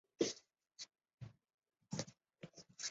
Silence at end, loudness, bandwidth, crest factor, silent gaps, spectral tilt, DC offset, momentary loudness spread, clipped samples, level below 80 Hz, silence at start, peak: 0 s; -47 LUFS; 8 kHz; 26 dB; 1.14-1.18 s, 1.54-1.58 s; -4 dB/octave; under 0.1%; 18 LU; under 0.1%; -80 dBFS; 0.2 s; -22 dBFS